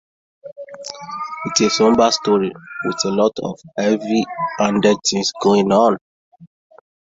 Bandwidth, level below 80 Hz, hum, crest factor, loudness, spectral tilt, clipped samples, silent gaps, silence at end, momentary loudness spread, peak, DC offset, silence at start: 7.8 kHz; -56 dBFS; none; 18 dB; -17 LUFS; -4 dB/octave; under 0.1%; 6.01-6.32 s; 0.55 s; 15 LU; -2 dBFS; under 0.1%; 0.45 s